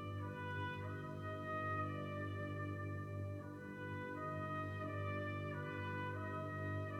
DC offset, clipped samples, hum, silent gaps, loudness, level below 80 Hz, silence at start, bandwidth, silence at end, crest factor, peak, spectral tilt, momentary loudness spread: under 0.1%; under 0.1%; 50 Hz at -65 dBFS; none; -45 LUFS; -74 dBFS; 0 s; 10.5 kHz; 0 s; 14 dB; -30 dBFS; -7.5 dB/octave; 4 LU